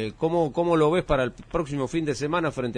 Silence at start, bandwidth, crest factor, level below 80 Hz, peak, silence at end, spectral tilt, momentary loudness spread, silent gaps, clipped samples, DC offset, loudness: 0 s; 10.5 kHz; 16 dB; -42 dBFS; -10 dBFS; 0 s; -6.5 dB/octave; 6 LU; none; under 0.1%; under 0.1%; -25 LUFS